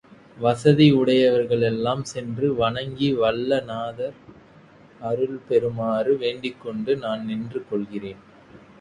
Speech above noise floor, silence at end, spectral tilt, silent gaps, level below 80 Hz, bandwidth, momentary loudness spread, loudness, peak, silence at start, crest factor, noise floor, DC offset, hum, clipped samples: 28 dB; 0.25 s; -7 dB/octave; none; -56 dBFS; 11 kHz; 14 LU; -22 LUFS; -4 dBFS; 0.35 s; 20 dB; -50 dBFS; under 0.1%; none; under 0.1%